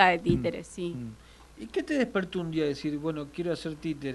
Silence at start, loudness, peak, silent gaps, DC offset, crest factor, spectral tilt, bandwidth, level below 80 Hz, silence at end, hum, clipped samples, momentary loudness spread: 0 s; -31 LUFS; -4 dBFS; none; under 0.1%; 26 dB; -6 dB/octave; 12 kHz; -52 dBFS; 0 s; none; under 0.1%; 10 LU